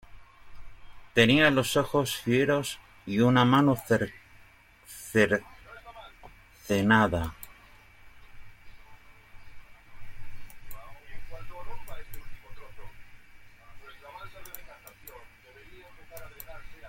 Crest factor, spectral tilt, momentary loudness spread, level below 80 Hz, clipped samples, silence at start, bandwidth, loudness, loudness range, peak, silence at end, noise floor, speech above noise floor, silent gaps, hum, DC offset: 22 dB; -5.5 dB/octave; 27 LU; -50 dBFS; under 0.1%; 0.1 s; 16.5 kHz; -25 LUFS; 24 LU; -8 dBFS; 0 s; -56 dBFS; 32 dB; none; none; under 0.1%